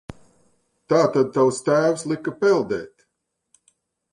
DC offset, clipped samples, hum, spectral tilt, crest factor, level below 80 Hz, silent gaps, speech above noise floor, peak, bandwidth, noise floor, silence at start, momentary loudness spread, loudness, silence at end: under 0.1%; under 0.1%; none; -5.5 dB/octave; 18 dB; -60 dBFS; none; 57 dB; -4 dBFS; 11.5 kHz; -77 dBFS; 0.1 s; 9 LU; -21 LUFS; 1.25 s